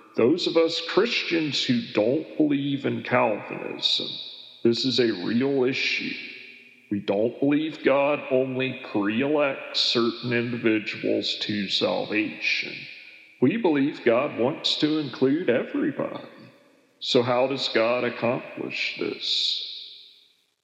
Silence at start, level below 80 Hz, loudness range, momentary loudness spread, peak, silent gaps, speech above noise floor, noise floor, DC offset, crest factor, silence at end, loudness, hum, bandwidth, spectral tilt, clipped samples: 0.15 s; -86 dBFS; 2 LU; 10 LU; -6 dBFS; none; 36 dB; -60 dBFS; under 0.1%; 20 dB; 0.55 s; -24 LUFS; none; 8.4 kHz; -5 dB/octave; under 0.1%